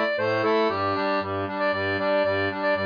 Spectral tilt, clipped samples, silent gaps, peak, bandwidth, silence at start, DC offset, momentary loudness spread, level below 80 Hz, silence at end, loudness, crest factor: -7 dB/octave; under 0.1%; none; -12 dBFS; 5.2 kHz; 0 s; under 0.1%; 3 LU; -68 dBFS; 0 s; -24 LUFS; 12 dB